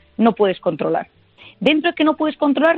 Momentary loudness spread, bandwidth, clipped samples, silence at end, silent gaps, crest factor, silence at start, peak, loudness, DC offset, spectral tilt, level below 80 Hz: 6 LU; 5.2 kHz; under 0.1%; 0 s; none; 16 dB; 0.2 s; -2 dBFS; -18 LUFS; under 0.1%; -7.5 dB/octave; -62 dBFS